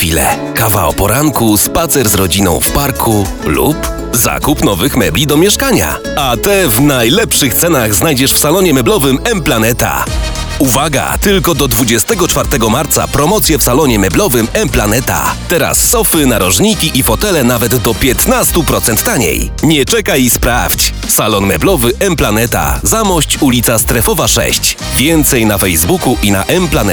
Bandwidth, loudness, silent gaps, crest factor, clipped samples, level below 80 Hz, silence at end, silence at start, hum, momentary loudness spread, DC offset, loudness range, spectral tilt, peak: over 20 kHz; -10 LUFS; none; 10 dB; under 0.1%; -22 dBFS; 0 s; 0 s; none; 4 LU; under 0.1%; 2 LU; -3.5 dB/octave; 0 dBFS